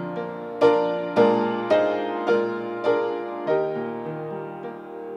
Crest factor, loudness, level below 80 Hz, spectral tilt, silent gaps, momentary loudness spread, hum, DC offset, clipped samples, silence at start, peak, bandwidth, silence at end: 18 dB; -23 LUFS; -72 dBFS; -7 dB/octave; none; 13 LU; none; under 0.1%; under 0.1%; 0 s; -6 dBFS; 7.2 kHz; 0 s